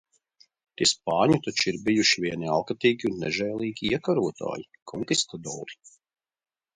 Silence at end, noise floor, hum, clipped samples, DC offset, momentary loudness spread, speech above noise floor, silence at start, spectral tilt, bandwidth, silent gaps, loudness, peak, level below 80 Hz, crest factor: 1 s; -63 dBFS; none; under 0.1%; under 0.1%; 14 LU; 37 dB; 0.8 s; -3.5 dB/octave; 11 kHz; 4.82-4.86 s; -25 LUFS; -8 dBFS; -60 dBFS; 20 dB